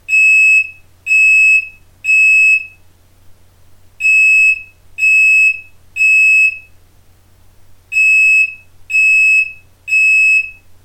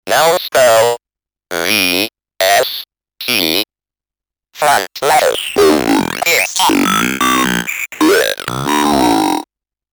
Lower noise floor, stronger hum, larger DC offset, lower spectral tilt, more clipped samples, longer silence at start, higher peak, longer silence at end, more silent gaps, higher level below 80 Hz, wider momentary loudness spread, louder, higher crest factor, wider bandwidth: second, -46 dBFS vs -89 dBFS; neither; neither; second, 1.5 dB/octave vs -2.5 dB/octave; neither; about the same, 0.1 s vs 0.05 s; about the same, -4 dBFS vs -2 dBFS; second, 0.35 s vs 0.5 s; neither; about the same, -50 dBFS vs -46 dBFS; first, 13 LU vs 8 LU; first, -8 LUFS vs -13 LUFS; about the same, 10 dB vs 12 dB; about the same, 19 kHz vs over 20 kHz